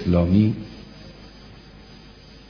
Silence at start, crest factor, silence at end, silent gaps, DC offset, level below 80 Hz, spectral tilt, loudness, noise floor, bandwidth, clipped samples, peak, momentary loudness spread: 0 s; 18 dB; 0.95 s; none; under 0.1%; -42 dBFS; -9.5 dB/octave; -20 LUFS; -45 dBFS; 5.4 kHz; under 0.1%; -6 dBFS; 26 LU